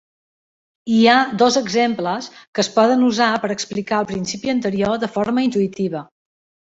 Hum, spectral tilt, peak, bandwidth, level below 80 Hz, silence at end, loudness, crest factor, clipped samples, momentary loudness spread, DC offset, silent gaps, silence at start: none; -4.5 dB/octave; -2 dBFS; 8 kHz; -58 dBFS; 0.65 s; -18 LUFS; 16 dB; under 0.1%; 10 LU; under 0.1%; 2.47-2.53 s; 0.85 s